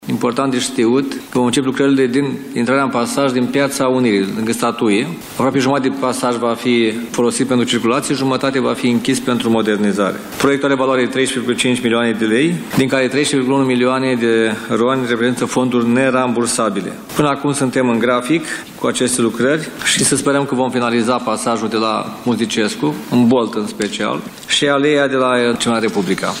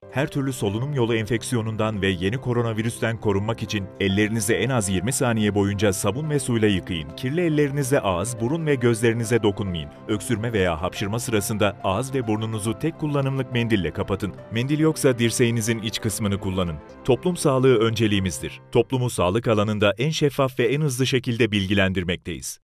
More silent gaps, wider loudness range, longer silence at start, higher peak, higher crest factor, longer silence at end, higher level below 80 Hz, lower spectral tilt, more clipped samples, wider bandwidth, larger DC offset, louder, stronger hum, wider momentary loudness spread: neither; about the same, 1 LU vs 3 LU; about the same, 0 s vs 0 s; first, -2 dBFS vs -6 dBFS; about the same, 14 dB vs 16 dB; second, 0 s vs 0.15 s; second, -54 dBFS vs -48 dBFS; second, -4 dB/octave vs -5.5 dB/octave; neither; about the same, 16 kHz vs 15.5 kHz; neither; first, -16 LUFS vs -23 LUFS; neither; about the same, 5 LU vs 7 LU